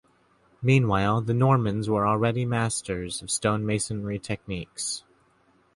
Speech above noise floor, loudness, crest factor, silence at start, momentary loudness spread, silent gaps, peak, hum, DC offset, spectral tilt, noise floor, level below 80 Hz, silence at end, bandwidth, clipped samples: 39 dB; -26 LUFS; 18 dB; 0.6 s; 10 LU; none; -8 dBFS; none; under 0.1%; -5.5 dB/octave; -63 dBFS; -50 dBFS; 0.75 s; 11.5 kHz; under 0.1%